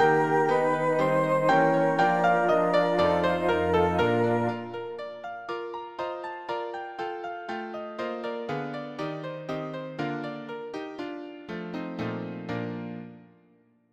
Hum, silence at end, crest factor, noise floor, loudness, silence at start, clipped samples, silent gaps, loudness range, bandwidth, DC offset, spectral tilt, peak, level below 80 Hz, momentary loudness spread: none; 0.65 s; 18 dB; -62 dBFS; -27 LUFS; 0 s; under 0.1%; none; 12 LU; 12.5 kHz; under 0.1%; -7 dB/octave; -10 dBFS; -60 dBFS; 14 LU